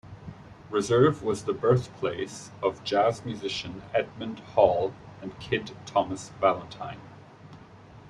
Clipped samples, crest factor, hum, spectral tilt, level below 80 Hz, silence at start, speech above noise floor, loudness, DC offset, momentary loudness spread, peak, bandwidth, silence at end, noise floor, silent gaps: under 0.1%; 22 dB; none; -5.5 dB/octave; -58 dBFS; 0.05 s; 22 dB; -27 LUFS; under 0.1%; 18 LU; -6 dBFS; 12 kHz; 0 s; -49 dBFS; none